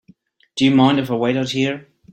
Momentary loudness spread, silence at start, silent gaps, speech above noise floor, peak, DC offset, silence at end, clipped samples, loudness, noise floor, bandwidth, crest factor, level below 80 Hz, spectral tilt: 13 LU; 0.55 s; none; 36 dB; -2 dBFS; under 0.1%; 0.3 s; under 0.1%; -17 LUFS; -53 dBFS; 12 kHz; 16 dB; -58 dBFS; -6 dB/octave